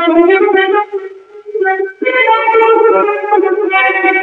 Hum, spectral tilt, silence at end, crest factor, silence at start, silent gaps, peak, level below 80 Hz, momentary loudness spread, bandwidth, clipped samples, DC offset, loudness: none; -5 dB/octave; 0 s; 10 dB; 0 s; none; 0 dBFS; -60 dBFS; 9 LU; 4.4 kHz; under 0.1%; under 0.1%; -10 LUFS